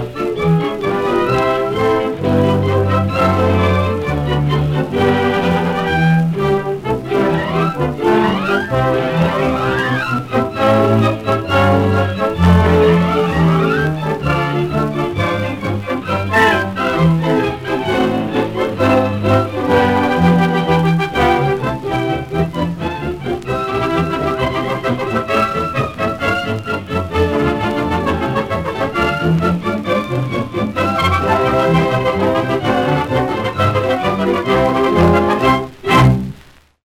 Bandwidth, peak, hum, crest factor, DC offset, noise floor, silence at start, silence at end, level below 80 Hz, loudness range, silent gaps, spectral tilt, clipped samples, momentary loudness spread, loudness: 16 kHz; 0 dBFS; none; 14 dB; under 0.1%; -44 dBFS; 0 s; 0.45 s; -34 dBFS; 4 LU; none; -7 dB/octave; under 0.1%; 7 LU; -15 LUFS